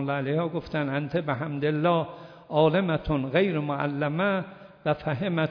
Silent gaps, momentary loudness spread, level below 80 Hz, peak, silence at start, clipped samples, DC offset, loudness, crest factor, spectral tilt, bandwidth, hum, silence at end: none; 7 LU; -52 dBFS; -10 dBFS; 0 s; under 0.1%; under 0.1%; -27 LUFS; 18 dB; -9.5 dB/octave; 5.4 kHz; none; 0 s